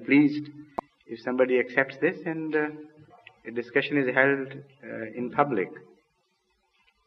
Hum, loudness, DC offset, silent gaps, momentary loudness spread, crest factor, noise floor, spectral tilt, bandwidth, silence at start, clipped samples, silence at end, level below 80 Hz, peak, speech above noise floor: none; -26 LUFS; under 0.1%; none; 17 LU; 22 dB; -72 dBFS; -8 dB/octave; 6 kHz; 0 s; under 0.1%; 1.3 s; -72 dBFS; -6 dBFS; 46 dB